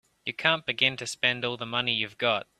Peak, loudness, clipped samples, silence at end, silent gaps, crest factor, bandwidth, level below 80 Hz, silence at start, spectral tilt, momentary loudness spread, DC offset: -6 dBFS; -26 LUFS; under 0.1%; 0.15 s; none; 24 dB; 14 kHz; -68 dBFS; 0.25 s; -3 dB/octave; 4 LU; under 0.1%